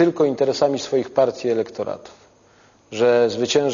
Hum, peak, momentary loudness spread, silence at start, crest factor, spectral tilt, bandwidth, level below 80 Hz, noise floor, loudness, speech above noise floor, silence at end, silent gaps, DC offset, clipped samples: none; -4 dBFS; 12 LU; 0 s; 16 dB; -5 dB/octave; 7.4 kHz; -64 dBFS; -54 dBFS; -20 LUFS; 34 dB; 0 s; none; under 0.1%; under 0.1%